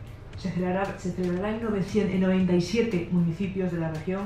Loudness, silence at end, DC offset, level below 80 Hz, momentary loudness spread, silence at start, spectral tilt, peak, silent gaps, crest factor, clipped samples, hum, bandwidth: -27 LUFS; 0 s; under 0.1%; -48 dBFS; 7 LU; 0 s; -7.5 dB/octave; -12 dBFS; none; 14 dB; under 0.1%; none; 9.4 kHz